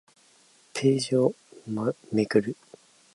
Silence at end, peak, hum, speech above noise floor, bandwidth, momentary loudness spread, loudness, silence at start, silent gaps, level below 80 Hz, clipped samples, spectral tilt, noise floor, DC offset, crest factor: 0.6 s; -8 dBFS; none; 35 dB; 11.5 kHz; 14 LU; -27 LUFS; 0.75 s; none; -68 dBFS; under 0.1%; -6 dB/octave; -60 dBFS; under 0.1%; 20 dB